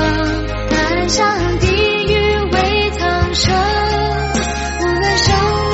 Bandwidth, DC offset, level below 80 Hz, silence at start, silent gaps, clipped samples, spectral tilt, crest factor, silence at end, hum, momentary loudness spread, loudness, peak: 8.2 kHz; under 0.1%; -24 dBFS; 0 s; none; under 0.1%; -4.5 dB/octave; 14 dB; 0 s; none; 5 LU; -15 LUFS; -2 dBFS